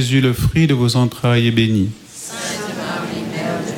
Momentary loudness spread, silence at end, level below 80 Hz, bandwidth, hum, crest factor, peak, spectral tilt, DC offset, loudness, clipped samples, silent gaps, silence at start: 9 LU; 0 s; -38 dBFS; 17 kHz; none; 14 dB; -2 dBFS; -5.5 dB/octave; under 0.1%; -17 LUFS; under 0.1%; none; 0 s